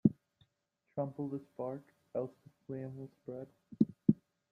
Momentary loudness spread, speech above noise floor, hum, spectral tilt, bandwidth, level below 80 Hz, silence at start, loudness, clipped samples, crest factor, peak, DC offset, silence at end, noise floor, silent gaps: 16 LU; 42 dB; none; -12 dB/octave; 4.3 kHz; -72 dBFS; 0.05 s; -39 LUFS; under 0.1%; 26 dB; -12 dBFS; under 0.1%; 0.35 s; -82 dBFS; none